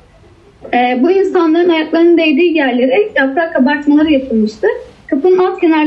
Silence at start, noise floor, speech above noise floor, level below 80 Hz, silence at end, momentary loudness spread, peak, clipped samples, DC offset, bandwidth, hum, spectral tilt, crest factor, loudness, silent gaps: 0.65 s; -43 dBFS; 32 dB; -48 dBFS; 0 s; 6 LU; -2 dBFS; under 0.1%; under 0.1%; 7.8 kHz; none; -6.5 dB/octave; 10 dB; -12 LUFS; none